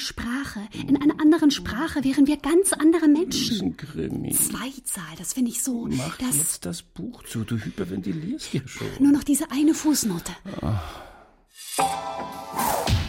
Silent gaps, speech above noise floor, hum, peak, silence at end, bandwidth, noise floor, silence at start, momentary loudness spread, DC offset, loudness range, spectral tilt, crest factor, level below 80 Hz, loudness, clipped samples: none; 27 dB; none; -10 dBFS; 0 s; 16.5 kHz; -51 dBFS; 0 s; 14 LU; under 0.1%; 6 LU; -4 dB/octave; 14 dB; -44 dBFS; -24 LUFS; under 0.1%